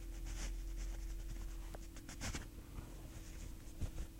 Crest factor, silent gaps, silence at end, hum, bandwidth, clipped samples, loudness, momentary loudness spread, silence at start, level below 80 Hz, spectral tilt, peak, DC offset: 16 dB; none; 0 s; none; 16 kHz; under 0.1%; -50 LUFS; 7 LU; 0 s; -46 dBFS; -4 dB/octave; -30 dBFS; under 0.1%